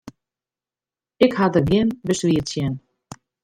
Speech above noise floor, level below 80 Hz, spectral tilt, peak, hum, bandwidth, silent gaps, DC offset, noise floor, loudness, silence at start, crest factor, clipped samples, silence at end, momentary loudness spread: over 71 dB; -48 dBFS; -6 dB/octave; -2 dBFS; none; 15 kHz; none; under 0.1%; under -90 dBFS; -20 LUFS; 0.05 s; 20 dB; under 0.1%; 0.65 s; 9 LU